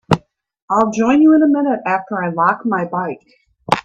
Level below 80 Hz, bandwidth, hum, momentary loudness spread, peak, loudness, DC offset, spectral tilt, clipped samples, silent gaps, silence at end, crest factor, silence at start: -52 dBFS; 9.2 kHz; none; 11 LU; 0 dBFS; -16 LUFS; under 0.1%; -6.5 dB/octave; under 0.1%; 0.62-0.68 s; 0.05 s; 16 dB; 0.1 s